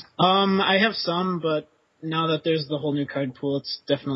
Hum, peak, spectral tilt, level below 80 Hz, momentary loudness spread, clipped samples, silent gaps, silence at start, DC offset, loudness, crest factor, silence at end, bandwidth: none; -6 dBFS; -8.5 dB/octave; -66 dBFS; 9 LU; under 0.1%; none; 0 s; under 0.1%; -23 LUFS; 18 dB; 0 s; 5.8 kHz